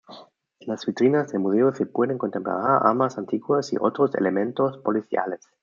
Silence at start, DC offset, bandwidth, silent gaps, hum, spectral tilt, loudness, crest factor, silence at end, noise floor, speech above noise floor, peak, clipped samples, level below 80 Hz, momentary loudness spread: 0.1 s; under 0.1%; 7.4 kHz; none; none; -7 dB/octave; -23 LUFS; 20 dB; 0.25 s; -50 dBFS; 28 dB; -2 dBFS; under 0.1%; -72 dBFS; 9 LU